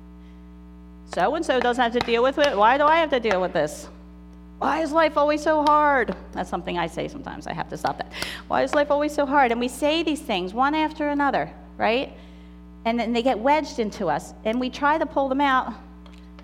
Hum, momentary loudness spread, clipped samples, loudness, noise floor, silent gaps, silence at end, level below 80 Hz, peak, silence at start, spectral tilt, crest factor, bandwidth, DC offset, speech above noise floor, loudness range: 60 Hz at -45 dBFS; 13 LU; under 0.1%; -23 LUFS; -43 dBFS; none; 0 s; -46 dBFS; -4 dBFS; 0 s; -4.5 dB/octave; 18 dB; 15.5 kHz; under 0.1%; 21 dB; 4 LU